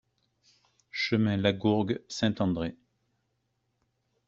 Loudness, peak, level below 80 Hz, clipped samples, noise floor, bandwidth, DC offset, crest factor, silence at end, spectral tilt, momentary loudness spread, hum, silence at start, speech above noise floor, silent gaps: -29 LUFS; -10 dBFS; -62 dBFS; under 0.1%; -77 dBFS; 7.6 kHz; under 0.1%; 22 dB; 1.55 s; -5 dB/octave; 8 LU; none; 0.95 s; 50 dB; none